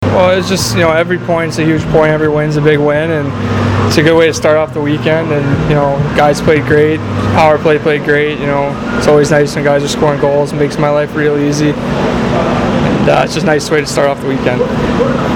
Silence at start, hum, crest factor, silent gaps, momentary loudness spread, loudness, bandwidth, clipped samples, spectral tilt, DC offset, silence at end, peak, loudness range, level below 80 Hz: 0 s; none; 10 dB; none; 5 LU; -11 LUFS; 17.5 kHz; under 0.1%; -6 dB/octave; under 0.1%; 0 s; 0 dBFS; 1 LU; -32 dBFS